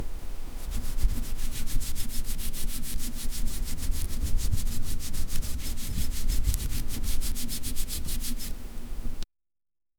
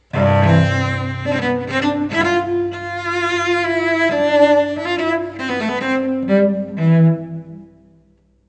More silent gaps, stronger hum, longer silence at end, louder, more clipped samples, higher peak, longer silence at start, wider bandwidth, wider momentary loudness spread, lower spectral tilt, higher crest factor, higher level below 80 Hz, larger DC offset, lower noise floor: neither; neither; about the same, 0.75 s vs 0.85 s; second, -35 LUFS vs -17 LUFS; neither; second, -8 dBFS vs 0 dBFS; second, 0 s vs 0.15 s; first, 19.5 kHz vs 8.6 kHz; about the same, 9 LU vs 9 LU; second, -3.5 dB/octave vs -7 dB/octave; about the same, 18 dB vs 16 dB; first, -28 dBFS vs -54 dBFS; neither; first, under -90 dBFS vs -55 dBFS